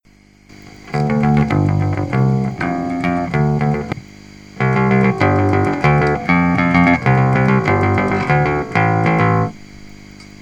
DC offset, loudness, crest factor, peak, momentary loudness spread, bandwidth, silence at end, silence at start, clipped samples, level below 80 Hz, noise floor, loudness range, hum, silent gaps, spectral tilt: under 0.1%; -15 LUFS; 16 dB; 0 dBFS; 6 LU; 8.8 kHz; 0.2 s; 0.65 s; under 0.1%; -38 dBFS; -48 dBFS; 4 LU; 50 Hz at -35 dBFS; none; -8 dB/octave